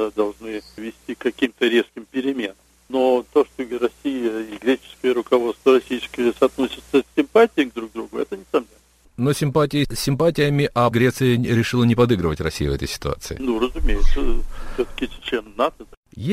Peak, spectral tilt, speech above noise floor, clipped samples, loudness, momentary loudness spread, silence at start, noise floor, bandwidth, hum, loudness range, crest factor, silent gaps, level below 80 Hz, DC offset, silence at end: -2 dBFS; -6 dB/octave; 34 dB; under 0.1%; -21 LUFS; 10 LU; 0 s; -54 dBFS; 15.5 kHz; none; 5 LU; 18 dB; 15.97-16.03 s; -30 dBFS; under 0.1%; 0 s